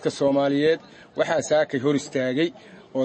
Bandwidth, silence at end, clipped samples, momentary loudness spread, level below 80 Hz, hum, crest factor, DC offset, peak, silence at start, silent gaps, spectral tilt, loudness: 8.8 kHz; 0 s; under 0.1%; 7 LU; -64 dBFS; none; 14 dB; under 0.1%; -8 dBFS; 0 s; none; -5 dB/octave; -23 LUFS